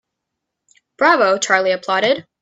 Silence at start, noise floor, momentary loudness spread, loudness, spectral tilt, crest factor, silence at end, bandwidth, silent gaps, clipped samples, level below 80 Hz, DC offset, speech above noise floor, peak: 1 s; -79 dBFS; 4 LU; -16 LUFS; -2.5 dB/octave; 18 dB; 0.2 s; 8 kHz; none; under 0.1%; -70 dBFS; under 0.1%; 63 dB; 0 dBFS